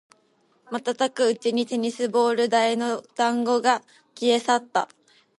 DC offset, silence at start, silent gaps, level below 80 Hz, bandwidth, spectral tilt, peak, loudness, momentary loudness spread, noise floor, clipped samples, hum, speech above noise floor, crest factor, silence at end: under 0.1%; 0.7 s; none; -78 dBFS; 11.5 kHz; -3 dB/octave; -6 dBFS; -23 LUFS; 7 LU; -64 dBFS; under 0.1%; none; 41 dB; 18 dB; 0.55 s